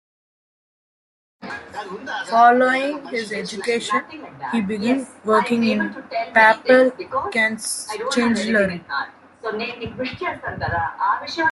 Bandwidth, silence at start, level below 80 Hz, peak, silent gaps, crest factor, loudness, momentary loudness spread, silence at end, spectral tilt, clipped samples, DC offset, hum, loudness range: 12 kHz; 1.4 s; -58 dBFS; -2 dBFS; none; 20 dB; -20 LUFS; 17 LU; 0 s; -4 dB/octave; under 0.1%; under 0.1%; none; 5 LU